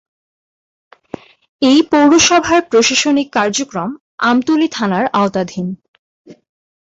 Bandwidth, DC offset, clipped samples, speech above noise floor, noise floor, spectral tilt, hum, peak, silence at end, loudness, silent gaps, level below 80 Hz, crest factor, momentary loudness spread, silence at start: 8 kHz; under 0.1%; under 0.1%; 21 dB; -34 dBFS; -3.5 dB/octave; none; 0 dBFS; 0.55 s; -13 LUFS; 4.01-4.18 s, 5.88-6.24 s; -50 dBFS; 14 dB; 17 LU; 1.6 s